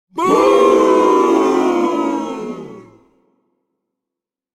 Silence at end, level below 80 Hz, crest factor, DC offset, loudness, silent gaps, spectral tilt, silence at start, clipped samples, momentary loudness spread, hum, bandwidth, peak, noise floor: 1.75 s; -56 dBFS; 14 dB; under 0.1%; -14 LUFS; none; -5 dB/octave; 0.15 s; under 0.1%; 15 LU; none; 13.5 kHz; -2 dBFS; -85 dBFS